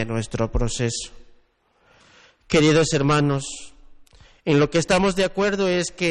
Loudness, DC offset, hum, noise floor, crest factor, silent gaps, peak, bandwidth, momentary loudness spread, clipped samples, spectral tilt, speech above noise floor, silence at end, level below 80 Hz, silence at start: -21 LUFS; under 0.1%; none; -62 dBFS; 16 dB; none; -6 dBFS; 12 kHz; 13 LU; under 0.1%; -5 dB/octave; 41 dB; 0 s; -38 dBFS; 0 s